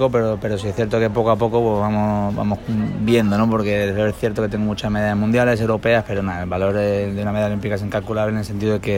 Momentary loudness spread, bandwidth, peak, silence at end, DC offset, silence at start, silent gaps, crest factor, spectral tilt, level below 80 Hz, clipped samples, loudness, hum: 6 LU; 16.5 kHz; -4 dBFS; 0 s; under 0.1%; 0 s; none; 14 dB; -7.5 dB/octave; -40 dBFS; under 0.1%; -20 LUFS; none